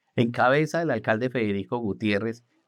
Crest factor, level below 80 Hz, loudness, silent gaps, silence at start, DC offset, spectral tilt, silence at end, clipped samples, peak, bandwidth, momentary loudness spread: 18 dB; -70 dBFS; -25 LUFS; none; 0.15 s; under 0.1%; -6.5 dB/octave; 0.3 s; under 0.1%; -8 dBFS; 12.5 kHz; 7 LU